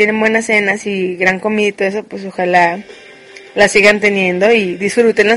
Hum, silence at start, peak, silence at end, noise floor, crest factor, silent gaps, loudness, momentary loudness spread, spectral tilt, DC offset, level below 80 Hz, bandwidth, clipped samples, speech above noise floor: none; 0 s; 0 dBFS; 0 s; -37 dBFS; 14 dB; none; -12 LUFS; 10 LU; -4 dB/octave; under 0.1%; -52 dBFS; 11.5 kHz; 0.1%; 24 dB